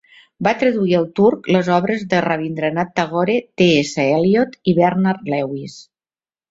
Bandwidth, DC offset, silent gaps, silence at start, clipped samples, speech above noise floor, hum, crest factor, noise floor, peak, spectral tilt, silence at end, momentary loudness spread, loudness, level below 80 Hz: 7.8 kHz; under 0.1%; none; 0.4 s; under 0.1%; over 73 dB; none; 16 dB; under -90 dBFS; -2 dBFS; -6.5 dB/octave; 0.7 s; 7 LU; -17 LUFS; -56 dBFS